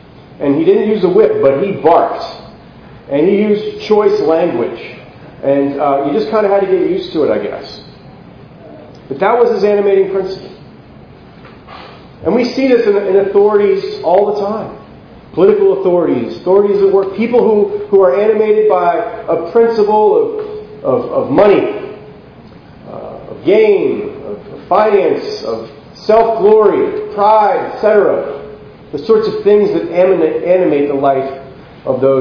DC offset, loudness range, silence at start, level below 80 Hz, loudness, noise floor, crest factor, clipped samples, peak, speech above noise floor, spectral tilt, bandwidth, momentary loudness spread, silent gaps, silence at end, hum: under 0.1%; 4 LU; 0.3 s; -48 dBFS; -12 LUFS; -37 dBFS; 12 dB; 0.1%; 0 dBFS; 26 dB; -8 dB/octave; 5.4 kHz; 17 LU; none; 0 s; none